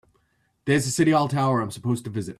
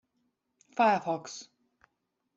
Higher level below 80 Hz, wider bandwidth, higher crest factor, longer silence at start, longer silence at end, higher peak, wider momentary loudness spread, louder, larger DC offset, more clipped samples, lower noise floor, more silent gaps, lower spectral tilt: first, -58 dBFS vs -80 dBFS; first, 14 kHz vs 8 kHz; about the same, 16 dB vs 20 dB; about the same, 0.65 s vs 0.75 s; second, 0.05 s vs 0.95 s; first, -8 dBFS vs -12 dBFS; second, 8 LU vs 18 LU; first, -23 LUFS vs -29 LUFS; neither; neither; second, -68 dBFS vs -81 dBFS; neither; about the same, -5.5 dB/octave vs -4.5 dB/octave